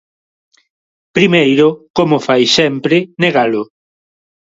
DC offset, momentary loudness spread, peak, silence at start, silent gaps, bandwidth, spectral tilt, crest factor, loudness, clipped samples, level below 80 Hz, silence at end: under 0.1%; 8 LU; 0 dBFS; 1.15 s; 1.90-1.94 s; 7.8 kHz; -5 dB/octave; 14 dB; -12 LUFS; under 0.1%; -54 dBFS; 0.85 s